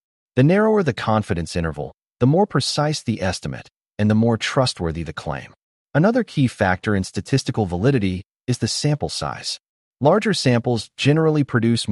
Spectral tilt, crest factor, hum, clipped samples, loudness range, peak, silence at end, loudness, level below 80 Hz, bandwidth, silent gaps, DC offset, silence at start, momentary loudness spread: -6 dB/octave; 16 dB; none; under 0.1%; 2 LU; -4 dBFS; 0 s; -20 LUFS; -46 dBFS; 11.5 kHz; 3.76-3.80 s, 5.63-5.86 s, 8.26-8.30 s, 9.69-9.92 s; under 0.1%; 0.35 s; 11 LU